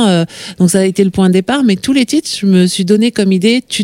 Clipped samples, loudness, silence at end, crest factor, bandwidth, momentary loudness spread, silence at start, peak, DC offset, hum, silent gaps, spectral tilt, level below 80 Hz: under 0.1%; -12 LUFS; 0 s; 10 dB; 15.5 kHz; 3 LU; 0 s; 0 dBFS; under 0.1%; none; none; -5.5 dB/octave; -46 dBFS